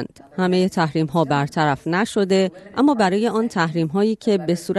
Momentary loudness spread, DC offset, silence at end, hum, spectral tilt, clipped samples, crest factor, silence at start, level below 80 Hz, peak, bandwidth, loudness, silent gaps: 3 LU; under 0.1%; 0 s; none; -6.5 dB/octave; under 0.1%; 14 dB; 0 s; -58 dBFS; -6 dBFS; 12.5 kHz; -20 LUFS; none